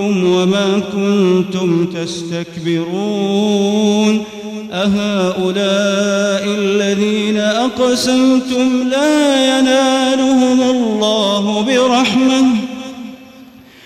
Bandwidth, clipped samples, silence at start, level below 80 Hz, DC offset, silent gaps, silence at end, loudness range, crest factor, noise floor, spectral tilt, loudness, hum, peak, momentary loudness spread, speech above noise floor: 14 kHz; under 0.1%; 0 s; -56 dBFS; under 0.1%; none; 0.4 s; 3 LU; 10 dB; -39 dBFS; -5 dB/octave; -14 LUFS; none; -4 dBFS; 8 LU; 26 dB